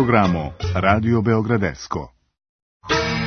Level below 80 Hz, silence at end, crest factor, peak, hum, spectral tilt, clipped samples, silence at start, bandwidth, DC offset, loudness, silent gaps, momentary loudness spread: -42 dBFS; 0 s; 20 dB; 0 dBFS; none; -6.5 dB/octave; under 0.1%; 0 s; 6.6 kHz; under 0.1%; -20 LUFS; 2.49-2.80 s; 12 LU